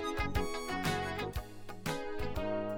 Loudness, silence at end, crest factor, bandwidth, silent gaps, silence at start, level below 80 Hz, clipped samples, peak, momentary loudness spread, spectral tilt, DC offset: -37 LUFS; 0 s; 18 dB; 18 kHz; none; 0 s; -46 dBFS; under 0.1%; -18 dBFS; 7 LU; -5 dB/octave; under 0.1%